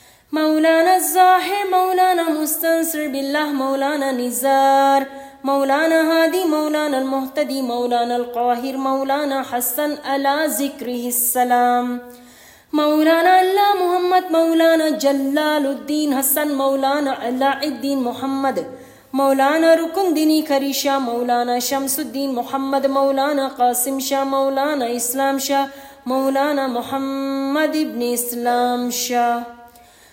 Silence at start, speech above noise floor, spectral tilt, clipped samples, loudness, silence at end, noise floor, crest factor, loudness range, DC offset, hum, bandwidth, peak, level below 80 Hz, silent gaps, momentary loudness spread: 0.3 s; 28 dB; -2 dB/octave; under 0.1%; -18 LUFS; 0.45 s; -46 dBFS; 16 dB; 4 LU; under 0.1%; none; 16.5 kHz; -2 dBFS; -64 dBFS; none; 8 LU